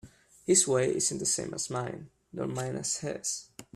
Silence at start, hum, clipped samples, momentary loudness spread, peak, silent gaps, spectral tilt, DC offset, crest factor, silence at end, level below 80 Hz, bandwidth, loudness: 0.05 s; none; under 0.1%; 15 LU; -10 dBFS; none; -3 dB/octave; under 0.1%; 22 dB; 0.15 s; -64 dBFS; 14.5 kHz; -29 LUFS